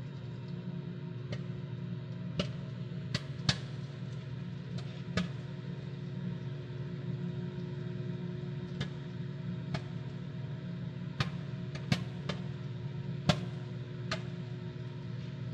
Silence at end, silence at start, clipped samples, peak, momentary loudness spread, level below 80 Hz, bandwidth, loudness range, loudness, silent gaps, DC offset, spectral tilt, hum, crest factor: 0 s; 0 s; under 0.1%; -10 dBFS; 7 LU; -62 dBFS; 9.6 kHz; 3 LU; -39 LUFS; none; under 0.1%; -6 dB/octave; none; 28 dB